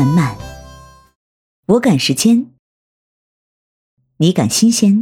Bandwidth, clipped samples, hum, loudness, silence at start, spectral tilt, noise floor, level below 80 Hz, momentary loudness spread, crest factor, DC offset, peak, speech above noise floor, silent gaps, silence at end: 17.5 kHz; under 0.1%; none; -14 LUFS; 0 s; -5 dB/octave; -40 dBFS; -46 dBFS; 19 LU; 14 dB; under 0.1%; -2 dBFS; 28 dB; 1.16-1.63 s, 2.59-3.97 s; 0 s